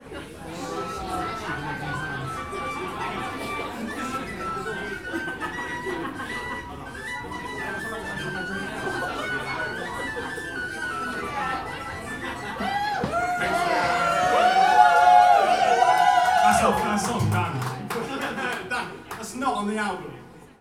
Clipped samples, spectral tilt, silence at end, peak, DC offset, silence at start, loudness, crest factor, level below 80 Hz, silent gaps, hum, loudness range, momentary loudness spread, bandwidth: under 0.1%; -4 dB/octave; 0.1 s; -4 dBFS; 0.1%; 0 s; -24 LUFS; 22 dB; -50 dBFS; none; none; 13 LU; 14 LU; 16 kHz